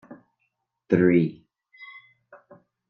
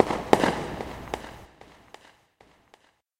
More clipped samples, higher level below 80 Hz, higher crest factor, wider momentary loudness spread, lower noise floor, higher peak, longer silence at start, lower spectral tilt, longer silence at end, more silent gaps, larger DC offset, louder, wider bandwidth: neither; second, -68 dBFS vs -50 dBFS; second, 22 dB vs 30 dB; about the same, 25 LU vs 24 LU; first, -76 dBFS vs -61 dBFS; second, -6 dBFS vs 0 dBFS; first, 0.9 s vs 0 s; first, -10 dB/octave vs -5 dB/octave; second, 1.05 s vs 1.55 s; neither; neither; first, -22 LUFS vs -27 LUFS; second, 6.4 kHz vs 16 kHz